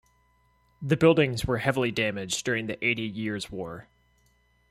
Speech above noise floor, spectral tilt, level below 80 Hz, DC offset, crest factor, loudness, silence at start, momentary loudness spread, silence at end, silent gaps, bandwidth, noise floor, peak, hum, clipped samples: 39 dB; -5 dB/octave; -52 dBFS; under 0.1%; 20 dB; -26 LUFS; 0.8 s; 16 LU; 0.9 s; none; 15.5 kHz; -66 dBFS; -8 dBFS; 60 Hz at -55 dBFS; under 0.1%